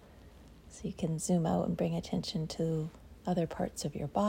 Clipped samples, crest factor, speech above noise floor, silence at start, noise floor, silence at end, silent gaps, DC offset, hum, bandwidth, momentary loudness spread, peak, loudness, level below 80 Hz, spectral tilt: under 0.1%; 18 dB; 22 dB; 0 s; -55 dBFS; 0 s; none; under 0.1%; none; 16 kHz; 12 LU; -18 dBFS; -35 LUFS; -56 dBFS; -6 dB/octave